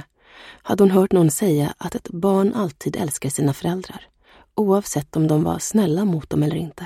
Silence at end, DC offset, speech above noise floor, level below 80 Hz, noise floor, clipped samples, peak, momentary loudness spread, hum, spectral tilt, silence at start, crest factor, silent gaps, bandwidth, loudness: 0 s; under 0.1%; 26 dB; -52 dBFS; -46 dBFS; under 0.1%; -4 dBFS; 13 LU; none; -6.5 dB/octave; 0.4 s; 16 dB; none; 16 kHz; -20 LUFS